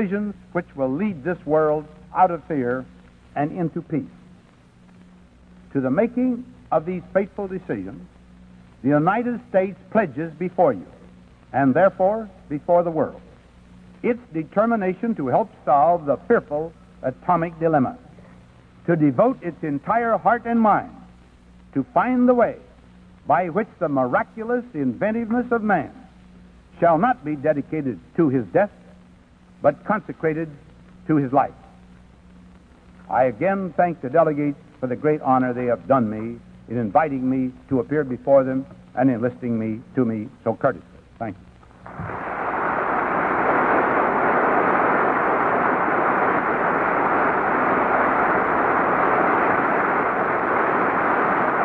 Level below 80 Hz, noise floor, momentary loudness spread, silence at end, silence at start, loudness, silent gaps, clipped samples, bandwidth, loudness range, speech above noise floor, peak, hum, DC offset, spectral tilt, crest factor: -54 dBFS; -51 dBFS; 11 LU; 0 s; 0 s; -21 LUFS; none; under 0.1%; 5 kHz; 6 LU; 30 dB; -4 dBFS; none; under 0.1%; -9.5 dB/octave; 18 dB